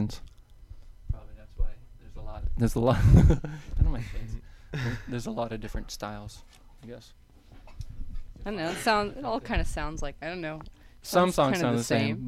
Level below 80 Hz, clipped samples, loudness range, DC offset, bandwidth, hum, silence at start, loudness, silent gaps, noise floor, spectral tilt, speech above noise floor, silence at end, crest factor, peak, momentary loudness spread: -34 dBFS; under 0.1%; 12 LU; under 0.1%; 15 kHz; none; 0 s; -28 LUFS; none; -50 dBFS; -6 dB/octave; 24 dB; 0 s; 22 dB; -8 dBFS; 22 LU